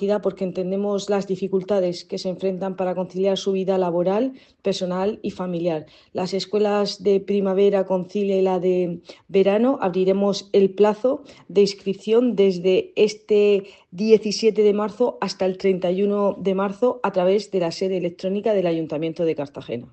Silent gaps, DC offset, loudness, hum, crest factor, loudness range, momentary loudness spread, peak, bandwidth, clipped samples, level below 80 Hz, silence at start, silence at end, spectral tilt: none; under 0.1%; -22 LUFS; none; 18 dB; 4 LU; 8 LU; -2 dBFS; 8.6 kHz; under 0.1%; -66 dBFS; 0 s; 0.05 s; -6.5 dB/octave